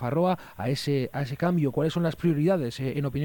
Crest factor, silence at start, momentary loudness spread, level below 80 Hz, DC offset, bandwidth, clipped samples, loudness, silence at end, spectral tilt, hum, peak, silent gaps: 14 dB; 0 s; 5 LU; -56 dBFS; under 0.1%; 17.5 kHz; under 0.1%; -27 LUFS; 0 s; -7.5 dB/octave; none; -12 dBFS; none